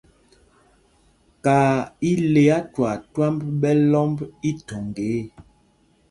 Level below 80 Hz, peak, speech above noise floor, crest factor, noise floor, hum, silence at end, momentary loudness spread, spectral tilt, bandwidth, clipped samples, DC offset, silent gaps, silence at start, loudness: -54 dBFS; -4 dBFS; 40 dB; 18 dB; -60 dBFS; none; 0.7 s; 11 LU; -7.5 dB/octave; 11.5 kHz; under 0.1%; under 0.1%; none; 1.45 s; -21 LUFS